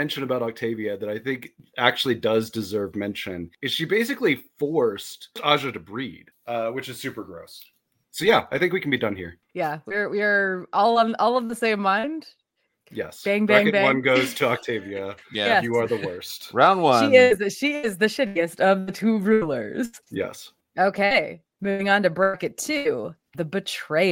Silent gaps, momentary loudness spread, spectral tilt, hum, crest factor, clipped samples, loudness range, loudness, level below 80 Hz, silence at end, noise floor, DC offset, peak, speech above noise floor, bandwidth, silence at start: none; 15 LU; -4.5 dB/octave; none; 22 dB; under 0.1%; 6 LU; -23 LUFS; -64 dBFS; 0 s; -66 dBFS; under 0.1%; -2 dBFS; 43 dB; 17 kHz; 0 s